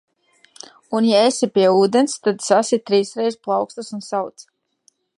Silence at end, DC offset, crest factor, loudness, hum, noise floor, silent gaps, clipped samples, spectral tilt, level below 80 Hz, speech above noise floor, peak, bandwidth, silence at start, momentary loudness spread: 0.9 s; under 0.1%; 18 dB; -18 LUFS; none; -61 dBFS; none; under 0.1%; -4.5 dB/octave; -72 dBFS; 44 dB; -2 dBFS; 11.5 kHz; 0.9 s; 11 LU